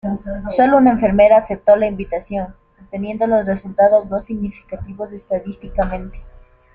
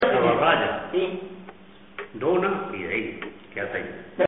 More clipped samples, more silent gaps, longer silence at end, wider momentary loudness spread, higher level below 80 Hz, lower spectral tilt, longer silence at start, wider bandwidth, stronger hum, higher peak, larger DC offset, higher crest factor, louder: neither; neither; first, 0.45 s vs 0 s; about the same, 18 LU vs 20 LU; first, -36 dBFS vs -58 dBFS; first, -10 dB/octave vs -3 dB/octave; about the same, 0.05 s vs 0 s; about the same, 4.2 kHz vs 4 kHz; neither; first, -2 dBFS vs -6 dBFS; second, under 0.1% vs 0.2%; about the same, 16 dB vs 18 dB; first, -16 LUFS vs -25 LUFS